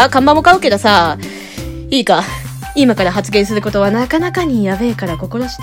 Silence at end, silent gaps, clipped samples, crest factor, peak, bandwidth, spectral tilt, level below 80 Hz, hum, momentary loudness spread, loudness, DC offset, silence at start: 0 s; none; 0.5%; 14 dB; 0 dBFS; 17 kHz; -5 dB/octave; -34 dBFS; none; 15 LU; -13 LUFS; under 0.1%; 0 s